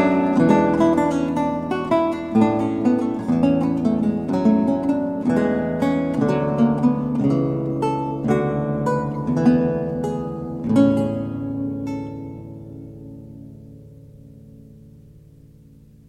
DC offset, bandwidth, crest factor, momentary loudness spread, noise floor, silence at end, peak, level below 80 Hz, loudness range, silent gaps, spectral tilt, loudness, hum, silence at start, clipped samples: under 0.1%; 10 kHz; 18 dB; 16 LU; -47 dBFS; 1.1 s; -4 dBFS; -48 dBFS; 12 LU; none; -8.5 dB/octave; -20 LUFS; none; 0 s; under 0.1%